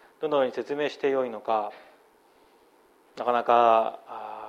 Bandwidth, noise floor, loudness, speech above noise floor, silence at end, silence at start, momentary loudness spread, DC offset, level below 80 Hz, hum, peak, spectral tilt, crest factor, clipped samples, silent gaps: 8 kHz; -60 dBFS; -25 LUFS; 35 dB; 0 s; 0.2 s; 13 LU; under 0.1%; -82 dBFS; none; -6 dBFS; -5.5 dB/octave; 20 dB; under 0.1%; none